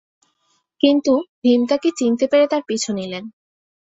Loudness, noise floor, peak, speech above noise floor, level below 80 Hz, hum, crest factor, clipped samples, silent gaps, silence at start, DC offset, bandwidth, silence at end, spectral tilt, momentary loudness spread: -18 LUFS; -67 dBFS; -2 dBFS; 49 dB; -64 dBFS; none; 18 dB; under 0.1%; 1.29-1.42 s; 0.85 s; under 0.1%; 8.2 kHz; 0.6 s; -4 dB/octave; 11 LU